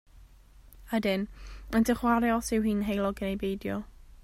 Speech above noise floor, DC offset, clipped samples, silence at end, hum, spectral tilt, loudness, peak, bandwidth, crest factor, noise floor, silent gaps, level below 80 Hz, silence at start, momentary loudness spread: 26 dB; under 0.1%; under 0.1%; 0.05 s; none; -5.5 dB/octave; -29 LUFS; -12 dBFS; 16 kHz; 18 dB; -54 dBFS; none; -48 dBFS; 0.15 s; 12 LU